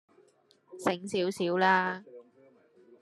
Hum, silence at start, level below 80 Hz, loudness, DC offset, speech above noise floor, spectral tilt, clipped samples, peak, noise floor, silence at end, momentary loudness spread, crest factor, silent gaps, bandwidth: none; 0.7 s; -80 dBFS; -29 LUFS; under 0.1%; 37 dB; -5 dB/octave; under 0.1%; -10 dBFS; -65 dBFS; 0.8 s; 9 LU; 22 dB; none; 12.5 kHz